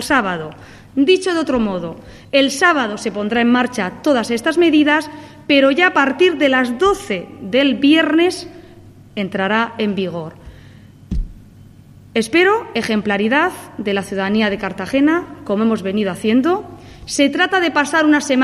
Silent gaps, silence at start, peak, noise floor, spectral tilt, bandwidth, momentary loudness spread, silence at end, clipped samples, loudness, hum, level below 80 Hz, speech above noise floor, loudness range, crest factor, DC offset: none; 0 s; 0 dBFS; -42 dBFS; -4.5 dB/octave; 13.5 kHz; 14 LU; 0 s; under 0.1%; -16 LUFS; none; -40 dBFS; 26 dB; 6 LU; 16 dB; under 0.1%